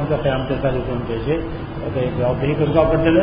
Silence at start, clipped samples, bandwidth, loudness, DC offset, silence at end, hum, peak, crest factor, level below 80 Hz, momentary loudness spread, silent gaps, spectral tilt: 0 s; under 0.1%; 5.2 kHz; -20 LUFS; under 0.1%; 0 s; none; -2 dBFS; 16 dB; -32 dBFS; 8 LU; none; -6.5 dB/octave